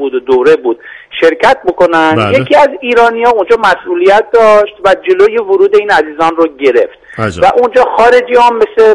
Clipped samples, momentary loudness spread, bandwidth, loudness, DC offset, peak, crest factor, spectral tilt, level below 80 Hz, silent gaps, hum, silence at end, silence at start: 1%; 5 LU; 11 kHz; -8 LUFS; under 0.1%; 0 dBFS; 8 dB; -5.5 dB/octave; -42 dBFS; none; none; 0 s; 0 s